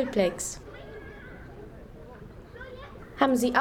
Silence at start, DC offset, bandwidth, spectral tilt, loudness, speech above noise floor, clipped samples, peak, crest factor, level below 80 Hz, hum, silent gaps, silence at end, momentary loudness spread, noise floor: 0 s; under 0.1%; 17.5 kHz; -4 dB/octave; -27 LUFS; 20 dB; under 0.1%; -8 dBFS; 22 dB; -50 dBFS; none; none; 0 s; 22 LU; -45 dBFS